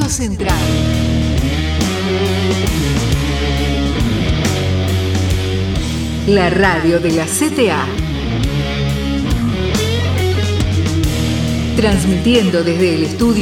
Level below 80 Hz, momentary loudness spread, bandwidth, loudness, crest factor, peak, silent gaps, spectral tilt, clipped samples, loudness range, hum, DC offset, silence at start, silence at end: -24 dBFS; 5 LU; 17 kHz; -15 LUFS; 14 dB; 0 dBFS; none; -5.5 dB/octave; under 0.1%; 2 LU; none; under 0.1%; 0 s; 0 s